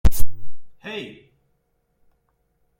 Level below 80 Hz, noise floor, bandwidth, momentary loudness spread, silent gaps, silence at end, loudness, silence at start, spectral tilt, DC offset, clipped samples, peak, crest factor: -28 dBFS; -69 dBFS; 16.5 kHz; 21 LU; none; 1.75 s; -32 LUFS; 0.05 s; -5 dB/octave; under 0.1%; under 0.1%; 0 dBFS; 16 dB